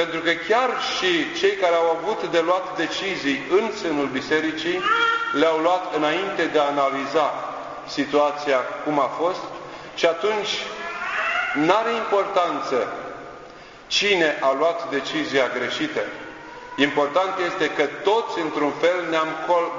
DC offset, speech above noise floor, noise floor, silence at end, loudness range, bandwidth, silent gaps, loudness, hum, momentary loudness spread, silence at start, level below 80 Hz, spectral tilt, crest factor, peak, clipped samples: under 0.1%; 21 dB; -42 dBFS; 0 s; 2 LU; 7.6 kHz; none; -22 LUFS; none; 10 LU; 0 s; -62 dBFS; -3.5 dB/octave; 20 dB; -2 dBFS; under 0.1%